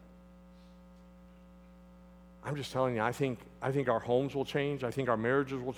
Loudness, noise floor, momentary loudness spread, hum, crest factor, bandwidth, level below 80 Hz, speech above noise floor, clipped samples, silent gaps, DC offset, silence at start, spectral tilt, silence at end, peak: -33 LUFS; -56 dBFS; 8 LU; none; 20 dB; 17 kHz; -62 dBFS; 23 dB; under 0.1%; none; under 0.1%; 0 s; -6.5 dB/octave; 0 s; -14 dBFS